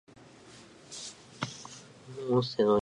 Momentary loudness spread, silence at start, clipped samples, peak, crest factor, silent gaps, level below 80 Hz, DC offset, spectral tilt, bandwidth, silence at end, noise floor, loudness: 25 LU; 0.45 s; under 0.1%; -14 dBFS; 20 dB; none; -66 dBFS; under 0.1%; -5.5 dB/octave; 11.5 kHz; 0.05 s; -54 dBFS; -33 LUFS